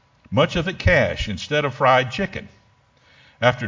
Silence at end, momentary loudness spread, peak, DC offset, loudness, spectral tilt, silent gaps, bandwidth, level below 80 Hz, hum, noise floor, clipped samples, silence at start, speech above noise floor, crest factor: 0 s; 10 LU; 0 dBFS; under 0.1%; -20 LUFS; -5.5 dB/octave; none; 7.6 kHz; -36 dBFS; none; -57 dBFS; under 0.1%; 0.3 s; 38 dB; 22 dB